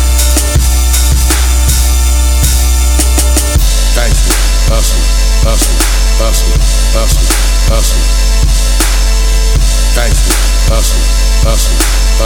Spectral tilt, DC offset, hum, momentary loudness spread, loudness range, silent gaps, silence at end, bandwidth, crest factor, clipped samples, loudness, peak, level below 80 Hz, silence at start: -3.5 dB/octave; under 0.1%; none; 2 LU; 1 LU; none; 0 s; 17.5 kHz; 8 dB; under 0.1%; -10 LUFS; 0 dBFS; -8 dBFS; 0 s